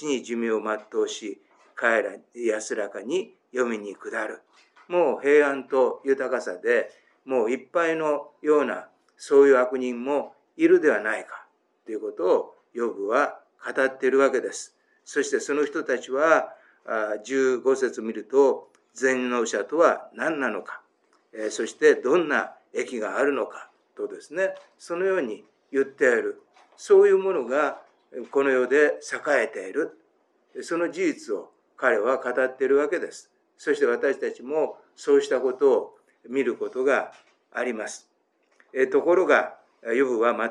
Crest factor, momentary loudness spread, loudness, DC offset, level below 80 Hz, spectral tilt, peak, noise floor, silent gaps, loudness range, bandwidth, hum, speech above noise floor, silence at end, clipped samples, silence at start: 20 dB; 15 LU; -24 LUFS; under 0.1%; under -90 dBFS; -4 dB/octave; -4 dBFS; -68 dBFS; none; 5 LU; 10.5 kHz; none; 44 dB; 0 s; under 0.1%; 0 s